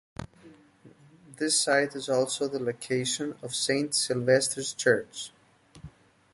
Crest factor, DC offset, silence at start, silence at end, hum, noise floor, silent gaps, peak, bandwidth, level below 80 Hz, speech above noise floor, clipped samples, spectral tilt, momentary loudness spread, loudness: 20 dB; under 0.1%; 0.2 s; 0.45 s; none; -56 dBFS; none; -8 dBFS; 11.5 kHz; -62 dBFS; 28 dB; under 0.1%; -3 dB/octave; 16 LU; -27 LUFS